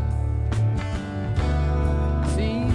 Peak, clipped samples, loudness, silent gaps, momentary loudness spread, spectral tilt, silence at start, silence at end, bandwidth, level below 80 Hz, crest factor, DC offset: -10 dBFS; under 0.1%; -24 LUFS; none; 4 LU; -7.5 dB/octave; 0 s; 0 s; 11 kHz; -28 dBFS; 12 dB; under 0.1%